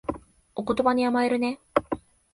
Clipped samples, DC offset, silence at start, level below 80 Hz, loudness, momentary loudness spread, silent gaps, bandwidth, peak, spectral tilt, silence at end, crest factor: under 0.1%; under 0.1%; 0.1 s; -54 dBFS; -26 LUFS; 13 LU; none; 11.5 kHz; -6 dBFS; -6 dB/octave; 0.35 s; 22 dB